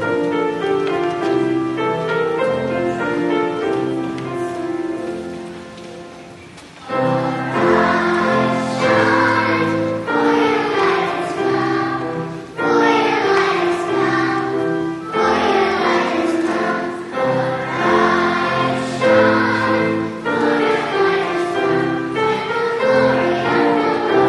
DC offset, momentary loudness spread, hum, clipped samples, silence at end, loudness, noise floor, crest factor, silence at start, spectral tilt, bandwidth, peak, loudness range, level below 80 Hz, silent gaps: under 0.1%; 9 LU; none; under 0.1%; 0 s; -17 LUFS; -38 dBFS; 16 dB; 0 s; -6 dB/octave; 11.5 kHz; 0 dBFS; 6 LU; -54 dBFS; none